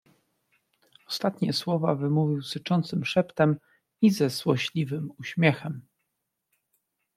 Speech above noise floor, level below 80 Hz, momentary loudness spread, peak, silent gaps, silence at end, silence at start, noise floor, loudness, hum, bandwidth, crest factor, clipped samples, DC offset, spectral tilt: 56 dB; -68 dBFS; 10 LU; -6 dBFS; none; 1.35 s; 1.1 s; -81 dBFS; -26 LUFS; none; 15 kHz; 20 dB; under 0.1%; under 0.1%; -6.5 dB/octave